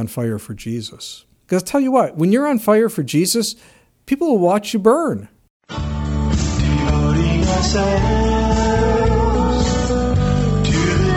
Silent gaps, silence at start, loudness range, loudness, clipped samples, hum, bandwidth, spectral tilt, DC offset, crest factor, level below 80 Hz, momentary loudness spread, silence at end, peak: 5.50-5.60 s; 0 s; 2 LU; -17 LUFS; under 0.1%; none; 17 kHz; -6 dB/octave; under 0.1%; 16 dB; -24 dBFS; 11 LU; 0 s; 0 dBFS